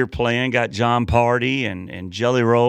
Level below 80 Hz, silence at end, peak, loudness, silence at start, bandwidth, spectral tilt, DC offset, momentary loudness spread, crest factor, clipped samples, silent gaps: -38 dBFS; 0 s; -2 dBFS; -19 LUFS; 0 s; 9.4 kHz; -6 dB/octave; under 0.1%; 8 LU; 16 dB; under 0.1%; none